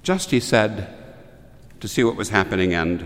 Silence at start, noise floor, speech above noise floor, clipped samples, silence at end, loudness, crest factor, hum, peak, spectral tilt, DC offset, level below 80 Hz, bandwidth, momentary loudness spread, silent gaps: 0.05 s; -45 dBFS; 24 dB; under 0.1%; 0 s; -20 LUFS; 20 dB; none; -2 dBFS; -5 dB/octave; under 0.1%; -46 dBFS; 16 kHz; 14 LU; none